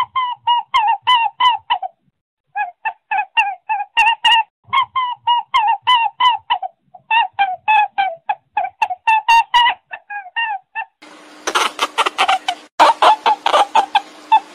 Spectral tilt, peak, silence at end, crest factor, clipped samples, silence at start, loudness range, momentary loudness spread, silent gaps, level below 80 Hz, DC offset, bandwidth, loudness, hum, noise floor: 0.5 dB/octave; 0 dBFS; 0.1 s; 16 dB; under 0.1%; 0 s; 3 LU; 12 LU; 2.21-2.44 s, 4.50-4.63 s, 12.72-12.78 s; -60 dBFS; under 0.1%; 15 kHz; -16 LUFS; none; -42 dBFS